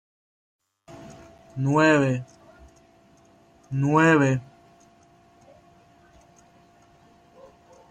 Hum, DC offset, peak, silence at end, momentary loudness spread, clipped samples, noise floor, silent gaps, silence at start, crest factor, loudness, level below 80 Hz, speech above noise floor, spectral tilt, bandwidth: none; under 0.1%; -6 dBFS; 3.45 s; 27 LU; under 0.1%; -56 dBFS; none; 0.9 s; 20 dB; -21 LUFS; -62 dBFS; 36 dB; -6.5 dB/octave; 9.6 kHz